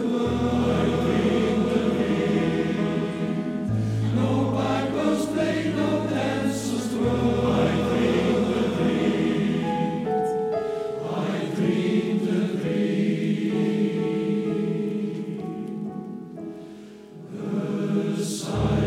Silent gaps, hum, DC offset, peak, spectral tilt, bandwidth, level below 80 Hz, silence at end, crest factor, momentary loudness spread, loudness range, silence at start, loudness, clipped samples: none; none; under 0.1%; -10 dBFS; -7 dB/octave; 14 kHz; -46 dBFS; 0 s; 14 dB; 10 LU; 6 LU; 0 s; -24 LUFS; under 0.1%